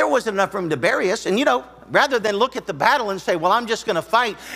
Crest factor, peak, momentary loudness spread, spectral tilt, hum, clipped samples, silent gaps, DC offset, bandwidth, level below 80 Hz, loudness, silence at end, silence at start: 18 dB; -2 dBFS; 4 LU; -4 dB/octave; none; under 0.1%; none; under 0.1%; 16 kHz; -56 dBFS; -20 LUFS; 0 s; 0 s